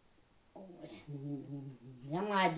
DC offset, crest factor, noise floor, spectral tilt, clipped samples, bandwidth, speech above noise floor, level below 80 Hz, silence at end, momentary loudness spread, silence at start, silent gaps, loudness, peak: under 0.1%; 20 dB; -67 dBFS; -4 dB/octave; under 0.1%; 4 kHz; 30 dB; -76 dBFS; 0 s; 20 LU; 0.55 s; none; -40 LUFS; -18 dBFS